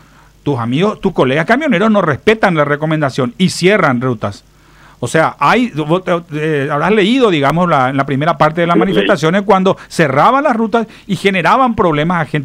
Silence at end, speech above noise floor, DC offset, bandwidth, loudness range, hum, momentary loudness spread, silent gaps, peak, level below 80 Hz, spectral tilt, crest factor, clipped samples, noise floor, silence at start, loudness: 0 s; 31 dB; under 0.1%; 15.5 kHz; 2 LU; none; 6 LU; none; 0 dBFS; -44 dBFS; -6 dB/octave; 12 dB; under 0.1%; -43 dBFS; 0.45 s; -12 LUFS